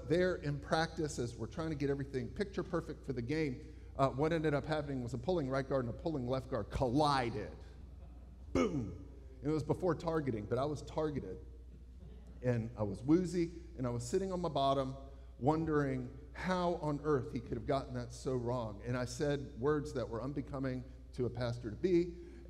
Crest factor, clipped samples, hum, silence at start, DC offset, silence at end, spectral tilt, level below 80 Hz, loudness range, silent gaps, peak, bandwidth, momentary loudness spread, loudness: 20 dB; under 0.1%; none; 0 s; under 0.1%; 0 s; -6.5 dB/octave; -52 dBFS; 3 LU; none; -16 dBFS; 13 kHz; 15 LU; -37 LUFS